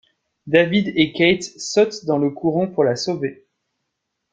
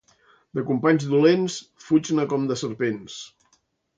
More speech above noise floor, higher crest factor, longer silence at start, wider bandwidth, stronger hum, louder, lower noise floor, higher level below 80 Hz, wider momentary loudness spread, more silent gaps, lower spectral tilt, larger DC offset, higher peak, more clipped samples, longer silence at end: first, 59 dB vs 45 dB; about the same, 20 dB vs 18 dB; about the same, 0.45 s vs 0.55 s; about the same, 9.2 kHz vs 9 kHz; neither; first, -19 LUFS vs -23 LUFS; first, -77 dBFS vs -67 dBFS; first, -58 dBFS vs -68 dBFS; second, 7 LU vs 17 LU; neither; about the same, -5 dB/octave vs -6 dB/octave; neither; first, 0 dBFS vs -6 dBFS; neither; first, 1 s vs 0.7 s